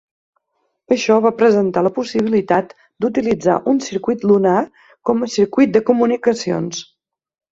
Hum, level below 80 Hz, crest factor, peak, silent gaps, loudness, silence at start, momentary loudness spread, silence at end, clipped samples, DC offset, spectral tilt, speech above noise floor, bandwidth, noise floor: none; -58 dBFS; 16 dB; -2 dBFS; none; -17 LUFS; 0.9 s; 9 LU; 0.75 s; under 0.1%; under 0.1%; -6 dB/octave; 54 dB; 7.8 kHz; -70 dBFS